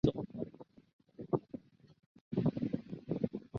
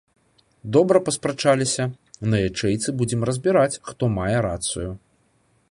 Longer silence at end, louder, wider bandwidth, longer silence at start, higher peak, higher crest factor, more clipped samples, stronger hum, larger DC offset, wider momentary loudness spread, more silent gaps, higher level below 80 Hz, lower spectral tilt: second, 0 s vs 0.75 s; second, -39 LUFS vs -22 LUFS; second, 6.8 kHz vs 11.5 kHz; second, 0.05 s vs 0.65 s; second, -16 dBFS vs -2 dBFS; about the same, 24 dB vs 20 dB; neither; neither; neither; first, 17 LU vs 10 LU; first, 0.93-0.99 s, 2.06-2.15 s, 2.21-2.31 s vs none; second, -60 dBFS vs -46 dBFS; first, -9 dB/octave vs -5 dB/octave